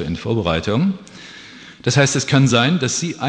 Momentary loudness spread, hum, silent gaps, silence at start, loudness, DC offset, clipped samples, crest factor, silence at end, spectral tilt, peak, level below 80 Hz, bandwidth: 22 LU; none; none; 0 s; -17 LUFS; under 0.1%; under 0.1%; 16 dB; 0 s; -4.5 dB/octave; -2 dBFS; -44 dBFS; 10 kHz